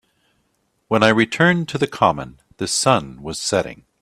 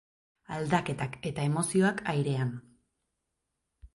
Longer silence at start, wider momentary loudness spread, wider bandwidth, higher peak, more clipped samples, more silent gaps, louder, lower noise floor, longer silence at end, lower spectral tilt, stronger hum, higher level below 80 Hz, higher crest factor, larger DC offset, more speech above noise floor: first, 0.9 s vs 0.5 s; first, 13 LU vs 10 LU; first, 14.5 kHz vs 11.5 kHz; first, 0 dBFS vs -14 dBFS; neither; neither; first, -18 LUFS vs -30 LUFS; second, -67 dBFS vs -83 dBFS; first, 0.3 s vs 0.1 s; second, -4 dB/octave vs -5.5 dB/octave; neither; first, -52 dBFS vs -60 dBFS; about the same, 20 dB vs 18 dB; neither; second, 49 dB vs 54 dB